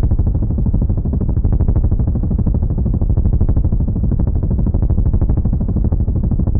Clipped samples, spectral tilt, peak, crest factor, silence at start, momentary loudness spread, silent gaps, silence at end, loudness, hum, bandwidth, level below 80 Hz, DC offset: under 0.1%; -16.5 dB/octave; -4 dBFS; 10 dB; 0 s; 2 LU; none; 0 s; -17 LUFS; none; 1.9 kHz; -16 dBFS; under 0.1%